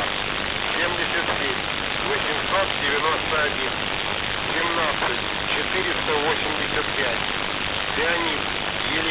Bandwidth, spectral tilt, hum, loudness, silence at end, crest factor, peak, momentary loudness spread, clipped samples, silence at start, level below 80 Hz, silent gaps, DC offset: 4 kHz; -7.5 dB/octave; none; -22 LUFS; 0 s; 16 dB; -8 dBFS; 3 LU; under 0.1%; 0 s; -44 dBFS; none; under 0.1%